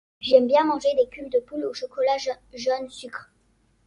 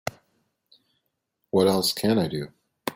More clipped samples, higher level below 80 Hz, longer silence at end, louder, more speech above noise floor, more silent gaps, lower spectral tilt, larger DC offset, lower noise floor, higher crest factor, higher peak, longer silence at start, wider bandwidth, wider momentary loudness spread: neither; about the same, -62 dBFS vs -62 dBFS; first, 0.65 s vs 0.05 s; about the same, -23 LUFS vs -24 LUFS; second, 41 dB vs 55 dB; neither; second, -3.5 dB/octave vs -5 dB/octave; neither; second, -64 dBFS vs -77 dBFS; about the same, 20 dB vs 20 dB; first, -4 dBFS vs -8 dBFS; first, 0.2 s vs 0.05 s; second, 11 kHz vs 16.5 kHz; about the same, 16 LU vs 15 LU